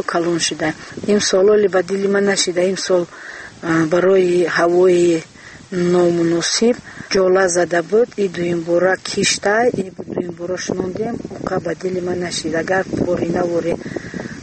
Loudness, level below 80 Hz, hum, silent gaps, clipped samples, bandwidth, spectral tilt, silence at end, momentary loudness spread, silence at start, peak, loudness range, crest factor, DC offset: -17 LUFS; -50 dBFS; none; none; under 0.1%; 8.8 kHz; -4 dB/octave; 0 s; 12 LU; 0 s; -2 dBFS; 5 LU; 14 dB; under 0.1%